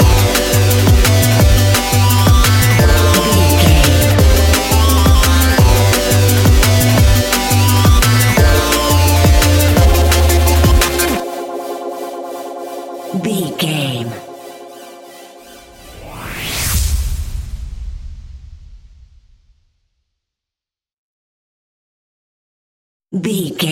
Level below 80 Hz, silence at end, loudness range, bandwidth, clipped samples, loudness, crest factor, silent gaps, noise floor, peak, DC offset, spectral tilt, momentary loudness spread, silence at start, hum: -18 dBFS; 0 s; 13 LU; 17 kHz; under 0.1%; -12 LUFS; 12 dB; 20.93-23.00 s; -89 dBFS; 0 dBFS; under 0.1%; -4.5 dB/octave; 16 LU; 0 s; none